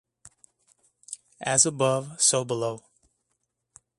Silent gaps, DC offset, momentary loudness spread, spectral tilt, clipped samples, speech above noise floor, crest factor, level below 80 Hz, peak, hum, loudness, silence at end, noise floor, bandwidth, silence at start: none; under 0.1%; 20 LU; -2.5 dB/octave; under 0.1%; 53 dB; 24 dB; -68 dBFS; -6 dBFS; none; -23 LUFS; 1.2 s; -78 dBFS; 11.5 kHz; 0.25 s